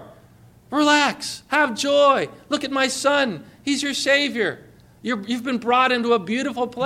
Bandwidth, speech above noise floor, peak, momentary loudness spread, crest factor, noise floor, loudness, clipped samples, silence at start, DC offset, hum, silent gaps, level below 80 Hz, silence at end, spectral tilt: 15 kHz; 29 dB; -6 dBFS; 10 LU; 16 dB; -50 dBFS; -20 LUFS; under 0.1%; 0 s; under 0.1%; 60 Hz at -55 dBFS; none; -62 dBFS; 0 s; -3 dB/octave